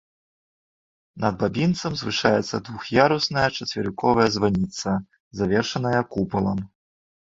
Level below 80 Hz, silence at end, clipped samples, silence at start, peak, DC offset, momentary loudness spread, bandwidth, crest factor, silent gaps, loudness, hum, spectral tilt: -50 dBFS; 0.6 s; under 0.1%; 1.15 s; -2 dBFS; under 0.1%; 9 LU; 7.8 kHz; 22 dB; 5.20-5.31 s; -23 LUFS; none; -5.5 dB/octave